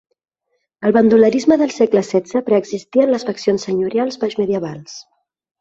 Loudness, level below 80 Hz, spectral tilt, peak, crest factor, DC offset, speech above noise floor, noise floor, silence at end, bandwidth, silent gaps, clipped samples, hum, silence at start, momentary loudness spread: -16 LUFS; -58 dBFS; -6 dB/octave; -2 dBFS; 16 dB; under 0.1%; 55 dB; -71 dBFS; 0.6 s; 7.8 kHz; none; under 0.1%; none; 0.8 s; 10 LU